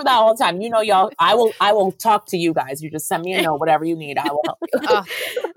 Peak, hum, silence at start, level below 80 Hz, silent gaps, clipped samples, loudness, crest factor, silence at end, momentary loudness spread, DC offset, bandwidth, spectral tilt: -4 dBFS; none; 0 s; -66 dBFS; none; under 0.1%; -18 LUFS; 14 dB; 0.05 s; 8 LU; under 0.1%; 17 kHz; -4 dB/octave